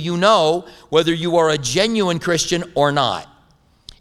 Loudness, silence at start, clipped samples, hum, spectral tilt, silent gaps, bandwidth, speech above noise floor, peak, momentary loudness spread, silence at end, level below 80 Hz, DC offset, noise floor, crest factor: -17 LUFS; 0 s; under 0.1%; none; -4 dB/octave; none; 15 kHz; 38 dB; 0 dBFS; 5 LU; 0.75 s; -48 dBFS; under 0.1%; -55 dBFS; 18 dB